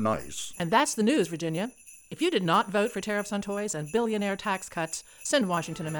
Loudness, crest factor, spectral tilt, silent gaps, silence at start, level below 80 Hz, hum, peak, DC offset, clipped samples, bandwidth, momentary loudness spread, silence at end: -28 LUFS; 18 dB; -4 dB/octave; none; 0 s; -62 dBFS; none; -10 dBFS; under 0.1%; under 0.1%; 20 kHz; 9 LU; 0 s